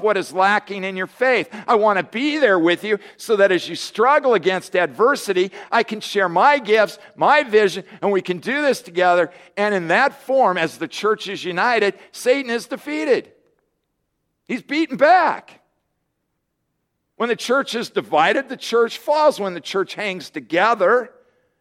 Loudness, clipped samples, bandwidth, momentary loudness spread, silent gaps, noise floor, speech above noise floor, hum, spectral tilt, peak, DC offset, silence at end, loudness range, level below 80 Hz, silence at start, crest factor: -19 LUFS; under 0.1%; 16 kHz; 9 LU; none; -74 dBFS; 55 dB; none; -4 dB/octave; -2 dBFS; under 0.1%; 0.5 s; 4 LU; -72 dBFS; 0 s; 18 dB